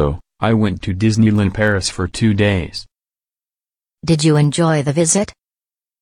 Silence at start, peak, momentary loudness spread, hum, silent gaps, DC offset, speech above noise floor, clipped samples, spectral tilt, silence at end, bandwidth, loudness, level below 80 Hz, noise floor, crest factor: 0 s; -2 dBFS; 8 LU; none; none; under 0.1%; over 75 dB; under 0.1%; -5.5 dB/octave; 0.7 s; 13 kHz; -16 LUFS; -38 dBFS; under -90 dBFS; 14 dB